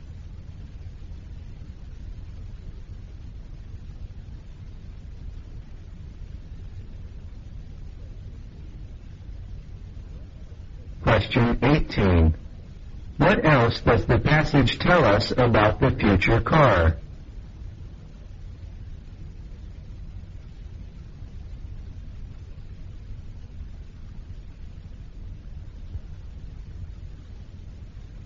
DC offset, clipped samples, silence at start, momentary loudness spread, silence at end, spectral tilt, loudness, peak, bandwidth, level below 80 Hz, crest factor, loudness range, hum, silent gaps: under 0.1%; under 0.1%; 0 s; 24 LU; 0 s; -5.5 dB/octave; -20 LUFS; -4 dBFS; 7.4 kHz; -36 dBFS; 22 dB; 22 LU; none; none